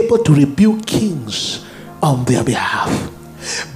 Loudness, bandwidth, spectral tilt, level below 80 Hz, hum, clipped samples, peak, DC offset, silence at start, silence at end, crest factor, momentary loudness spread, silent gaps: -16 LUFS; 15.5 kHz; -5.5 dB/octave; -44 dBFS; none; under 0.1%; 0 dBFS; under 0.1%; 0 s; 0 s; 16 dB; 14 LU; none